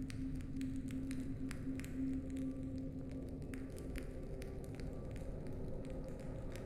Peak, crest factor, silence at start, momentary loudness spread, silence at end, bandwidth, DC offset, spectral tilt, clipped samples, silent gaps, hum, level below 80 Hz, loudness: -26 dBFS; 18 dB; 0 s; 5 LU; 0 s; 15.5 kHz; under 0.1%; -7.5 dB/octave; under 0.1%; none; none; -50 dBFS; -46 LUFS